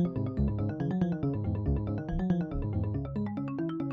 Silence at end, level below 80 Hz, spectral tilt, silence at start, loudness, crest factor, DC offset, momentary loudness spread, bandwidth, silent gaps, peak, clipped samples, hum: 0 s; -40 dBFS; -11 dB/octave; 0 s; -32 LUFS; 14 dB; under 0.1%; 4 LU; 5 kHz; none; -16 dBFS; under 0.1%; none